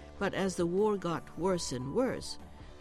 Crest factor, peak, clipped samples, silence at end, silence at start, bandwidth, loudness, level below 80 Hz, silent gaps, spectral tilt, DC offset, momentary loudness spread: 14 dB; -18 dBFS; under 0.1%; 0 s; 0 s; 13.5 kHz; -33 LUFS; -54 dBFS; none; -5 dB/octave; under 0.1%; 12 LU